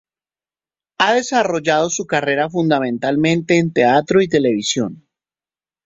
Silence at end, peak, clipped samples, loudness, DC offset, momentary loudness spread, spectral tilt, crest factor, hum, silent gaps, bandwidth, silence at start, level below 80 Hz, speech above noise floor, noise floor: 0.9 s; -2 dBFS; under 0.1%; -17 LUFS; under 0.1%; 5 LU; -4.5 dB/octave; 16 dB; none; none; 8 kHz; 1 s; -58 dBFS; over 74 dB; under -90 dBFS